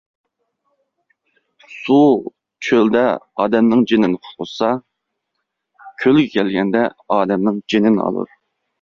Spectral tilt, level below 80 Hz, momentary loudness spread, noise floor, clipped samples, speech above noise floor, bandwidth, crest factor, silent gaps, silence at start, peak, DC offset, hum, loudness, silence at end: -7 dB/octave; -58 dBFS; 13 LU; -76 dBFS; under 0.1%; 60 dB; 7.2 kHz; 16 dB; none; 1.7 s; -2 dBFS; under 0.1%; none; -16 LUFS; 0.55 s